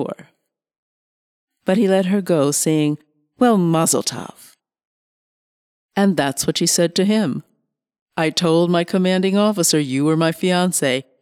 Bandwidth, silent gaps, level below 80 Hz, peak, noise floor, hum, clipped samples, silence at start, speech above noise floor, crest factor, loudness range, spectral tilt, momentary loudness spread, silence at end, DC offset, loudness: 17 kHz; 0.78-1.48 s, 4.85-5.89 s, 8.01-8.06 s; -64 dBFS; -4 dBFS; -70 dBFS; none; under 0.1%; 0 s; 52 dB; 14 dB; 3 LU; -4.5 dB/octave; 11 LU; 0.2 s; under 0.1%; -18 LUFS